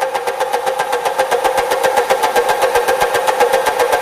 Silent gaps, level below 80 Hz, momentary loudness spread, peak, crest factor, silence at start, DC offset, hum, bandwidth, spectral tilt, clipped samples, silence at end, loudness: none; -48 dBFS; 4 LU; -2 dBFS; 14 dB; 0 s; under 0.1%; none; 15.5 kHz; -1.5 dB/octave; under 0.1%; 0 s; -15 LUFS